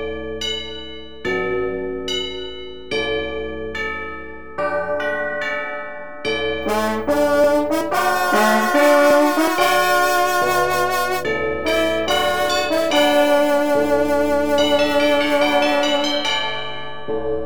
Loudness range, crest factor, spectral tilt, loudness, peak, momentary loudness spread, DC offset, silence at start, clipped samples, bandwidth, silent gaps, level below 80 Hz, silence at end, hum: 9 LU; 16 dB; -3 dB/octave; -18 LUFS; -2 dBFS; 12 LU; 2%; 0 s; under 0.1%; over 20 kHz; none; -44 dBFS; 0 s; none